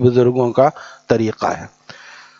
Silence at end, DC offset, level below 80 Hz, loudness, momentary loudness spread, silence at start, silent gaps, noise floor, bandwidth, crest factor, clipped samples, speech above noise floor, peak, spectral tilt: 0.7 s; under 0.1%; -54 dBFS; -17 LUFS; 23 LU; 0 s; none; -40 dBFS; 7.4 kHz; 18 dB; under 0.1%; 24 dB; 0 dBFS; -7.5 dB/octave